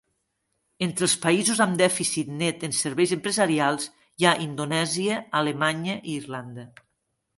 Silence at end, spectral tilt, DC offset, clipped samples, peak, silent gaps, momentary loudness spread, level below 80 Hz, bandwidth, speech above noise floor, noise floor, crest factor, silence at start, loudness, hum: 0.7 s; -3.5 dB/octave; under 0.1%; under 0.1%; -2 dBFS; none; 11 LU; -68 dBFS; 12 kHz; 52 dB; -77 dBFS; 24 dB; 0.8 s; -24 LUFS; none